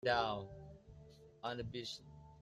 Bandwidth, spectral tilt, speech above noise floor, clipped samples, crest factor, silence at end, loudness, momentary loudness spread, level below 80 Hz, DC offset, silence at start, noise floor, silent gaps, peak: 13.5 kHz; -4.5 dB/octave; 20 dB; under 0.1%; 20 dB; 0 s; -43 LUFS; 23 LU; -64 dBFS; under 0.1%; 0.05 s; -60 dBFS; none; -22 dBFS